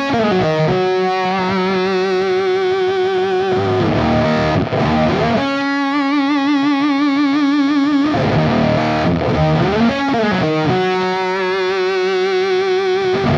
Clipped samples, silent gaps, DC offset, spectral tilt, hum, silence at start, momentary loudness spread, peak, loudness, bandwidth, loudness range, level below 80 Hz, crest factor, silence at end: under 0.1%; none; under 0.1%; -7 dB/octave; none; 0 s; 2 LU; -4 dBFS; -16 LUFS; 7.6 kHz; 1 LU; -40 dBFS; 12 dB; 0 s